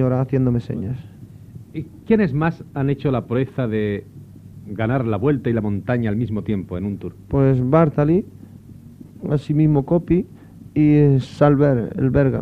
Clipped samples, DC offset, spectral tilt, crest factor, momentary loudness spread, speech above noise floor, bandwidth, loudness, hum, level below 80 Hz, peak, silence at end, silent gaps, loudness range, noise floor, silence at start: under 0.1%; under 0.1%; -10 dB/octave; 16 dB; 16 LU; 22 dB; 6 kHz; -19 LUFS; none; -42 dBFS; -4 dBFS; 0 s; none; 5 LU; -41 dBFS; 0 s